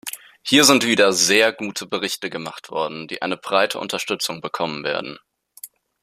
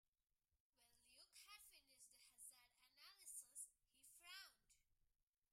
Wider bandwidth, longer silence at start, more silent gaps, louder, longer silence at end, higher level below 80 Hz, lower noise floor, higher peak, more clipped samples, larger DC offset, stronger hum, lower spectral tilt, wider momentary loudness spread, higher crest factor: about the same, 15.5 kHz vs 16 kHz; second, 0.05 s vs 0.5 s; second, none vs 0.60-0.73 s; first, -19 LUFS vs -62 LUFS; about the same, 0.35 s vs 0.3 s; first, -66 dBFS vs under -90 dBFS; second, -44 dBFS vs -89 dBFS; first, 0 dBFS vs -42 dBFS; neither; neither; neither; first, -2 dB/octave vs 2.5 dB/octave; first, 18 LU vs 11 LU; about the same, 22 dB vs 24 dB